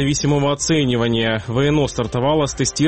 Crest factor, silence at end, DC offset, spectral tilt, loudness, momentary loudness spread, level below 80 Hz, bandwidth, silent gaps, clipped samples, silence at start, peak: 12 dB; 0 s; 0.4%; -5 dB/octave; -18 LUFS; 3 LU; -38 dBFS; 8.8 kHz; none; under 0.1%; 0 s; -6 dBFS